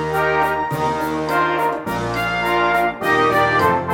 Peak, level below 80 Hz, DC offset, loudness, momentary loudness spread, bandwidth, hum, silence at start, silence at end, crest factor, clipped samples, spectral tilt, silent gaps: -4 dBFS; -44 dBFS; under 0.1%; -18 LUFS; 6 LU; 19 kHz; none; 0 s; 0 s; 14 dB; under 0.1%; -5.5 dB/octave; none